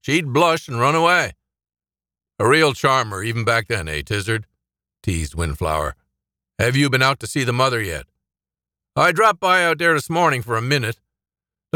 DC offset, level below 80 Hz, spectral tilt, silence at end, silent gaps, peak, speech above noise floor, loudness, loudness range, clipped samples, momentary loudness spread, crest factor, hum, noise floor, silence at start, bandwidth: under 0.1%; -40 dBFS; -4.5 dB/octave; 0.85 s; none; -4 dBFS; over 72 dB; -19 LUFS; 5 LU; under 0.1%; 11 LU; 16 dB; none; under -90 dBFS; 0.05 s; 20 kHz